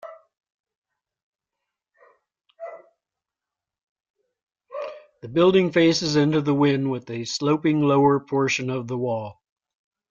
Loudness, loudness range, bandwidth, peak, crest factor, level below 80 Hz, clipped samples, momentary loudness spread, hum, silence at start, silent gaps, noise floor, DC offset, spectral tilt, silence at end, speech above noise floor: -21 LUFS; 14 LU; 7.4 kHz; -6 dBFS; 18 dB; -64 dBFS; under 0.1%; 21 LU; none; 0.05 s; 0.54-0.64 s, 0.77-0.82 s, 1.23-1.33 s, 3.83-3.96 s, 4.10-4.14 s, 4.43-4.47 s; -88 dBFS; under 0.1%; -6 dB/octave; 0.8 s; 68 dB